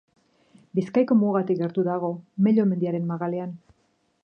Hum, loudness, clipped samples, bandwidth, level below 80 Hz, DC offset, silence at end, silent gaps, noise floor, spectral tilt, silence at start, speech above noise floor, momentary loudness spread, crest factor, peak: none; -24 LUFS; under 0.1%; 6 kHz; -72 dBFS; under 0.1%; 0.65 s; none; -68 dBFS; -10 dB/octave; 0.75 s; 45 dB; 10 LU; 16 dB; -10 dBFS